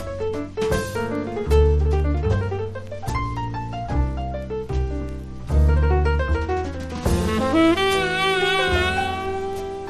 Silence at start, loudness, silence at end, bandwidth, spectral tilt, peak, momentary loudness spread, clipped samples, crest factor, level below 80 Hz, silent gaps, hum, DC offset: 0 s; -22 LUFS; 0 s; 13.5 kHz; -6 dB/octave; -6 dBFS; 11 LU; under 0.1%; 16 dB; -26 dBFS; none; none; under 0.1%